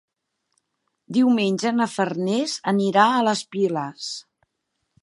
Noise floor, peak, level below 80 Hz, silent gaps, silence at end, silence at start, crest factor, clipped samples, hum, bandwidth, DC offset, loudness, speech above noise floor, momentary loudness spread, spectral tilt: -77 dBFS; -2 dBFS; -76 dBFS; none; 0.8 s; 1.1 s; 20 dB; under 0.1%; none; 11.5 kHz; under 0.1%; -22 LUFS; 56 dB; 12 LU; -5 dB/octave